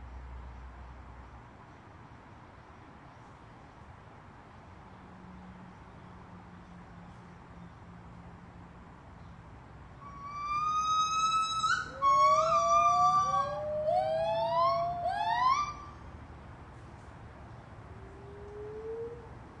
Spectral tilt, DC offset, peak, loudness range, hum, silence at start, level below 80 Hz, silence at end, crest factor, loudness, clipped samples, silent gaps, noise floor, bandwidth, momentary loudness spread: -3.5 dB/octave; under 0.1%; -16 dBFS; 25 LU; none; 0 s; -56 dBFS; 0 s; 18 dB; -29 LUFS; under 0.1%; none; -52 dBFS; 10.5 kHz; 27 LU